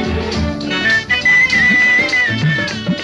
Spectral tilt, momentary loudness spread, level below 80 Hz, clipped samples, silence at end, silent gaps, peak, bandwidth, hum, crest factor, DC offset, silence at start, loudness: -4.5 dB/octave; 10 LU; -32 dBFS; under 0.1%; 0 s; none; -4 dBFS; 11.5 kHz; none; 12 dB; under 0.1%; 0 s; -12 LUFS